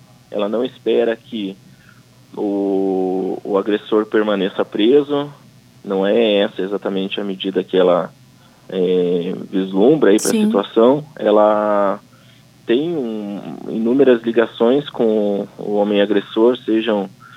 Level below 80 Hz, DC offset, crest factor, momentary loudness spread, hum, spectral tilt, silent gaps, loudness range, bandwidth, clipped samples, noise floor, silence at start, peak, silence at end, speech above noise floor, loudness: -66 dBFS; under 0.1%; 16 dB; 11 LU; none; -5.5 dB/octave; none; 4 LU; 15.5 kHz; under 0.1%; -47 dBFS; 0.3 s; -2 dBFS; 0 s; 30 dB; -17 LUFS